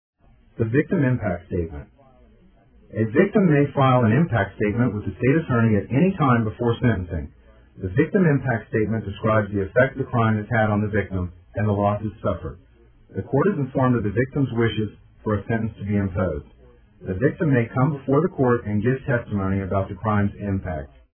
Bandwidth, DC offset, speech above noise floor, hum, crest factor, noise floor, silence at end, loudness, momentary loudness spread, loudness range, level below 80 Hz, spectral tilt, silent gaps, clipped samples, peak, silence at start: 3.5 kHz; under 0.1%; 32 dB; none; 18 dB; -54 dBFS; 0.35 s; -22 LUFS; 12 LU; 4 LU; -46 dBFS; -12 dB/octave; none; under 0.1%; -4 dBFS; 0.6 s